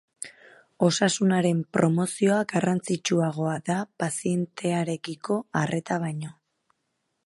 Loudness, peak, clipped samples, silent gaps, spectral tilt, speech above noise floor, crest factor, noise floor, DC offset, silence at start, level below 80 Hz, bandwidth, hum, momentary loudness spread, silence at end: -26 LUFS; -6 dBFS; under 0.1%; none; -5.5 dB/octave; 52 dB; 20 dB; -77 dBFS; under 0.1%; 0.2 s; -70 dBFS; 11.5 kHz; none; 10 LU; 0.95 s